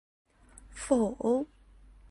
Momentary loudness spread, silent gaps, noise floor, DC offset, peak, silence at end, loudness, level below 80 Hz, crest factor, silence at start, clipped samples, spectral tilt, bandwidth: 15 LU; none; -56 dBFS; under 0.1%; -12 dBFS; 0.65 s; -29 LUFS; -56 dBFS; 20 dB; 0.7 s; under 0.1%; -5.5 dB/octave; 11.5 kHz